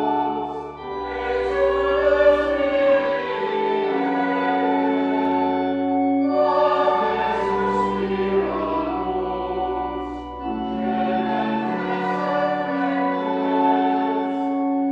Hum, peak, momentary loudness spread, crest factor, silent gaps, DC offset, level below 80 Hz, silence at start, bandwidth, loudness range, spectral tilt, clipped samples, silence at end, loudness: none; -6 dBFS; 8 LU; 16 dB; none; under 0.1%; -46 dBFS; 0 s; 7.6 kHz; 5 LU; -7 dB/octave; under 0.1%; 0 s; -21 LUFS